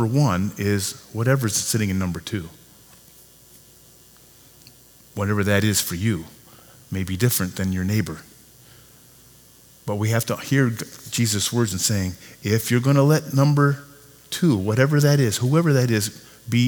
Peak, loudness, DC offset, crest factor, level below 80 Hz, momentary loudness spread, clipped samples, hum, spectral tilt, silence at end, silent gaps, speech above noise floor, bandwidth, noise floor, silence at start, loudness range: -4 dBFS; -21 LUFS; under 0.1%; 20 dB; -54 dBFS; 13 LU; under 0.1%; none; -5 dB/octave; 0 s; none; 30 dB; over 20 kHz; -51 dBFS; 0 s; 8 LU